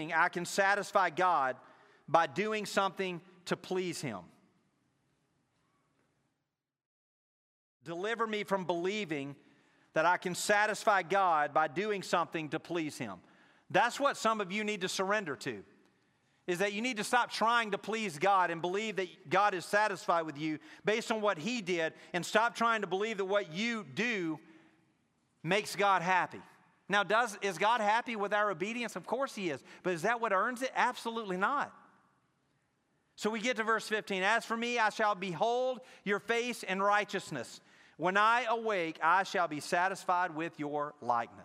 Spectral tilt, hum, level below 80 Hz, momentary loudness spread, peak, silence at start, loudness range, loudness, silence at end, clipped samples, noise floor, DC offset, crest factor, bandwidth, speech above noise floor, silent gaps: -3.5 dB/octave; none; -86 dBFS; 10 LU; -10 dBFS; 0 s; 6 LU; -32 LUFS; 0 s; under 0.1%; -88 dBFS; under 0.1%; 22 dB; 16 kHz; 55 dB; 6.86-7.80 s